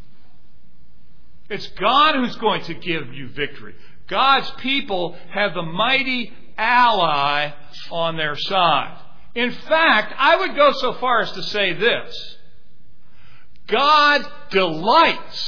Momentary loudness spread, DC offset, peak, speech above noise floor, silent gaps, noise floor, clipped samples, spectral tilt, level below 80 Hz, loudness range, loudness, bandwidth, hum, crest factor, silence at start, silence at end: 13 LU; 4%; -2 dBFS; 36 dB; none; -55 dBFS; under 0.1%; -4.5 dB/octave; -52 dBFS; 4 LU; -18 LUFS; 5.4 kHz; none; 18 dB; 1.5 s; 0 s